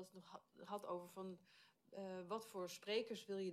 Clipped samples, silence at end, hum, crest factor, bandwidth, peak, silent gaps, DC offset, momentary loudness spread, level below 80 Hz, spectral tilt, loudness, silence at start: under 0.1%; 0 s; none; 18 dB; 15 kHz; -32 dBFS; none; under 0.1%; 17 LU; under -90 dBFS; -4.5 dB/octave; -49 LUFS; 0 s